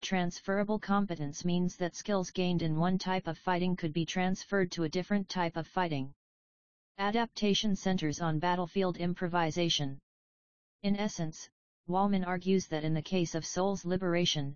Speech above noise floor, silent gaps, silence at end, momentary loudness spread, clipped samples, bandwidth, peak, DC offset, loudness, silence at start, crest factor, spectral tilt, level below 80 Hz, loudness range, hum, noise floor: over 58 dB; 6.16-6.95 s, 10.03-10.79 s, 11.52-11.84 s; 0 s; 6 LU; under 0.1%; 7.2 kHz; -16 dBFS; 0.5%; -32 LUFS; 0 s; 16 dB; -5 dB/octave; -58 dBFS; 2 LU; none; under -90 dBFS